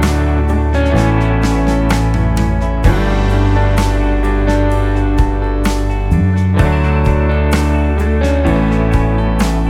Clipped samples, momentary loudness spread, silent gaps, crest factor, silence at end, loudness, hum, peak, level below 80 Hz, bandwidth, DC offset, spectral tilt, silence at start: under 0.1%; 2 LU; none; 12 dB; 0 s; -14 LUFS; none; 0 dBFS; -16 dBFS; 13.5 kHz; under 0.1%; -7 dB/octave; 0 s